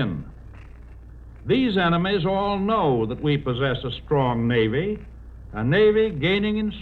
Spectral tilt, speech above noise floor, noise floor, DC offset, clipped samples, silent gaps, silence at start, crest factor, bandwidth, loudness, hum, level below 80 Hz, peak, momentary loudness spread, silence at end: -9 dB/octave; 20 dB; -42 dBFS; under 0.1%; under 0.1%; none; 0 s; 14 dB; 4.7 kHz; -22 LUFS; none; -42 dBFS; -8 dBFS; 10 LU; 0 s